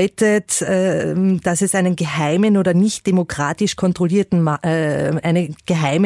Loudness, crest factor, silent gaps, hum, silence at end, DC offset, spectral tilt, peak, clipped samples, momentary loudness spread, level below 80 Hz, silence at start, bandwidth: -17 LUFS; 12 dB; none; none; 0 s; under 0.1%; -5.5 dB/octave; -4 dBFS; under 0.1%; 4 LU; -52 dBFS; 0 s; 12 kHz